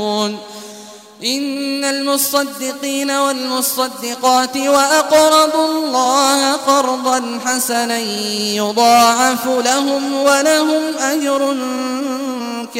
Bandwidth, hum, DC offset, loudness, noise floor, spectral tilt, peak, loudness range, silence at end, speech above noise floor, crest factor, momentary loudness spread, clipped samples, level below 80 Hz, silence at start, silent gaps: 16 kHz; none; under 0.1%; -15 LUFS; -37 dBFS; -1.5 dB/octave; 0 dBFS; 4 LU; 0 s; 21 dB; 16 dB; 10 LU; under 0.1%; -62 dBFS; 0 s; none